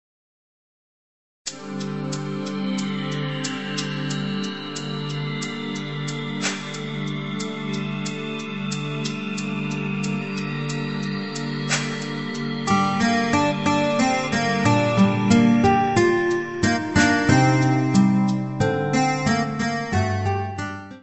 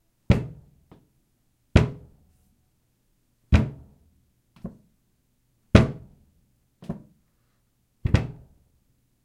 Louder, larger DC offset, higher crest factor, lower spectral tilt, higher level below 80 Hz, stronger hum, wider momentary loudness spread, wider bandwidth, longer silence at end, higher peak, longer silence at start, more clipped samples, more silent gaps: about the same, -23 LUFS vs -24 LUFS; first, 0.3% vs under 0.1%; second, 18 dB vs 28 dB; second, -5.5 dB/octave vs -7.5 dB/octave; second, -50 dBFS vs -36 dBFS; neither; second, 11 LU vs 23 LU; second, 8.4 kHz vs 10 kHz; second, 0 s vs 0.95 s; second, -4 dBFS vs 0 dBFS; first, 1.45 s vs 0.3 s; neither; neither